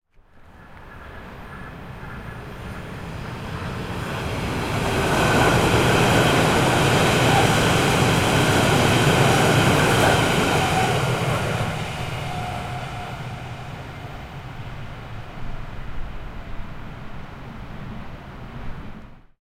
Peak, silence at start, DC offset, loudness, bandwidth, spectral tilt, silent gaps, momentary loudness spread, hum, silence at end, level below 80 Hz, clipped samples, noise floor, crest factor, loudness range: -4 dBFS; 0.35 s; under 0.1%; -19 LUFS; 16.5 kHz; -4.5 dB/octave; none; 21 LU; none; 0.2 s; -38 dBFS; under 0.1%; -49 dBFS; 18 dB; 19 LU